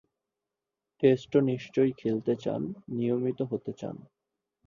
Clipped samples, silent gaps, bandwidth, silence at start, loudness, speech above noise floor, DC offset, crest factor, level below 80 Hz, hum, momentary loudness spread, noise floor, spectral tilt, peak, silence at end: under 0.1%; none; 7.4 kHz; 1 s; -29 LUFS; 60 dB; under 0.1%; 20 dB; -68 dBFS; none; 12 LU; -88 dBFS; -8.5 dB/octave; -10 dBFS; 0.65 s